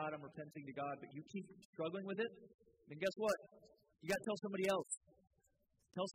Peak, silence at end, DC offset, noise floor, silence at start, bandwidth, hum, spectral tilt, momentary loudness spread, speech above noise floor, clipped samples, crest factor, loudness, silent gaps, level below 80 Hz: -26 dBFS; 0 s; under 0.1%; -81 dBFS; 0 s; 15.5 kHz; none; -4.5 dB/octave; 13 LU; 36 dB; under 0.1%; 20 dB; -44 LUFS; 1.65-1.73 s, 2.54-2.59 s, 4.97-5.01 s; -80 dBFS